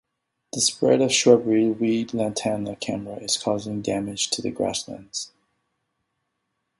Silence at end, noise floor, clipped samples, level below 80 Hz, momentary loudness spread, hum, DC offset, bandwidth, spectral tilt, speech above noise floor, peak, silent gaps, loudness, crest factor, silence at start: 1.55 s; -77 dBFS; under 0.1%; -60 dBFS; 14 LU; none; under 0.1%; 11.5 kHz; -3.5 dB/octave; 55 dB; -2 dBFS; none; -23 LUFS; 22 dB; 0.55 s